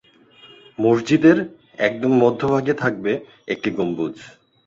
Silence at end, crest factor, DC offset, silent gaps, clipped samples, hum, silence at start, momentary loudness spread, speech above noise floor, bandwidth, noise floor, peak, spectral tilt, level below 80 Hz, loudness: 0.4 s; 18 dB; under 0.1%; none; under 0.1%; none; 0.45 s; 14 LU; 31 dB; 7.6 kHz; -50 dBFS; -2 dBFS; -7 dB/octave; -58 dBFS; -20 LUFS